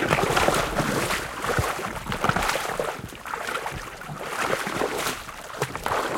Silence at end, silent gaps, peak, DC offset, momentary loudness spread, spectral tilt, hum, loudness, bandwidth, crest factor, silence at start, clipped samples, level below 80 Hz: 0 s; none; -4 dBFS; under 0.1%; 12 LU; -3.5 dB/octave; none; -26 LUFS; 17 kHz; 24 dB; 0 s; under 0.1%; -44 dBFS